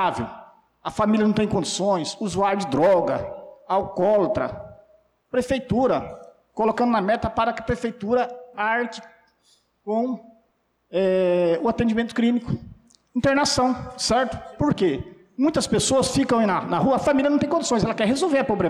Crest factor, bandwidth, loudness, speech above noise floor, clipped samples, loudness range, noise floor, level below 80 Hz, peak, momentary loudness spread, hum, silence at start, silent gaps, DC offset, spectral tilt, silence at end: 10 dB; 13 kHz; -22 LUFS; 47 dB; under 0.1%; 4 LU; -68 dBFS; -48 dBFS; -12 dBFS; 11 LU; none; 0 s; none; under 0.1%; -5 dB/octave; 0 s